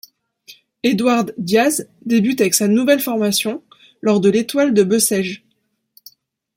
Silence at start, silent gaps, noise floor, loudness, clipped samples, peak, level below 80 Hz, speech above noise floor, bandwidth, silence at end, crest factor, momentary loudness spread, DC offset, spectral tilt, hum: 0.5 s; none; -67 dBFS; -16 LUFS; under 0.1%; 0 dBFS; -62 dBFS; 51 dB; 16.5 kHz; 1.2 s; 18 dB; 9 LU; under 0.1%; -4 dB/octave; none